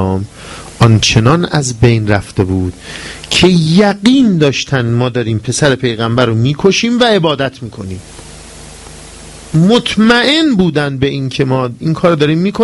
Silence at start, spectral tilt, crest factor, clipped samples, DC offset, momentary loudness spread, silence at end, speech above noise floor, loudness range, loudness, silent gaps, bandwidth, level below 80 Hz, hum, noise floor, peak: 0 s; -5.5 dB/octave; 12 dB; 0.2%; under 0.1%; 20 LU; 0 s; 21 dB; 3 LU; -11 LUFS; none; 12 kHz; -36 dBFS; none; -32 dBFS; 0 dBFS